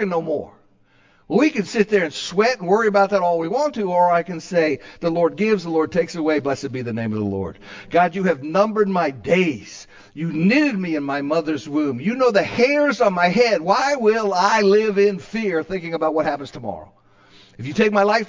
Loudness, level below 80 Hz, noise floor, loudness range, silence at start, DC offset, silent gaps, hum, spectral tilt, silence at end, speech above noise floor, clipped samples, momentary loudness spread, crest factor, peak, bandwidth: -19 LUFS; -56 dBFS; -56 dBFS; 4 LU; 0 s; under 0.1%; none; none; -5.5 dB/octave; 0 s; 37 dB; under 0.1%; 10 LU; 16 dB; -2 dBFS; 7.6 kHz